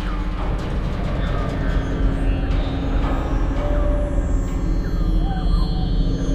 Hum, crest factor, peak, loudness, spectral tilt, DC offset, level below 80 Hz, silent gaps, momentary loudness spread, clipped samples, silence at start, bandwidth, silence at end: none; 12 dB; -6 dBFS; -23 LUFS; -7.5 dB/octave; under 0.1%; -20 dBFS; none; 3 LU; under 0.1%; 0 s; 8 kHz; 0 s